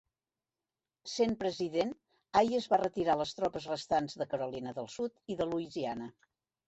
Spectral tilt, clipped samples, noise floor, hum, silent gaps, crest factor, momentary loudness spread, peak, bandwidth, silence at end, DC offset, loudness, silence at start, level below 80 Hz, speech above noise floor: -5 dB/octave; under 0.1%; under -90 dBFS; none; none; 20 dB; 11 LU; -14 dBFS; 8.2 kHz; 0.55 s; under 0.1%; -34 LUFS; 1.05 s; -66 dBFS; over 57 dB